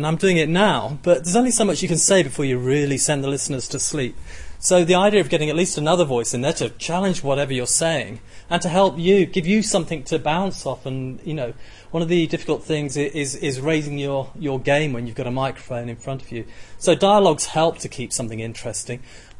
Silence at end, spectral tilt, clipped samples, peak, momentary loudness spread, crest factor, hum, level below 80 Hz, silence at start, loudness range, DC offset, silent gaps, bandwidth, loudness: 0 s; -4 dB/octave; under 0.1%; -4 dBFS; 13 LU; 16 dB; none; -44 dBFS; 0 s; 5 LU; under 0.1%; none; 11.5 kHz; -20 LUFS